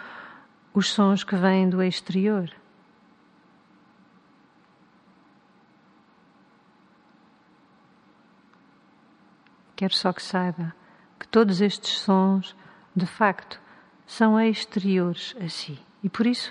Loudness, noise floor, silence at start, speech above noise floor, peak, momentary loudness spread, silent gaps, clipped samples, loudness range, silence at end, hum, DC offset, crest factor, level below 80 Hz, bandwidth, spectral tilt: -24 LUFS; -59 dBFS; 0 s; 35 dB; -6 dBFS; 18 LU; none; under 0.1%; 8 LU; 0 s; none; under 0.1%; 22 dB; -72 dBFS; 10.5 kHz; -6 dB/octave